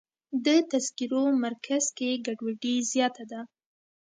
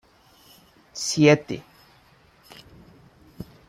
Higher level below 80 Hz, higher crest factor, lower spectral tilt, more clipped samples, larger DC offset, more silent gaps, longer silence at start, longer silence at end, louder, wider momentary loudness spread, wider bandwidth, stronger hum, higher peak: second, -82 dBFS vs -60 dBFS; second, 18 dB vs 24 dB; second, -2.5 dB/octave vs -5 dB/octave; neither; neither; neither; second, 0.3 s vs 0.95 s; first, 0.7 s vs 0.25 s; second, -28 LUFS vs -21 LUFS; second, 14 LU vs 25 LU; second, 9.6 kHz vs 15 kHz; neither; second, -12 dBFS vs -4 dBFS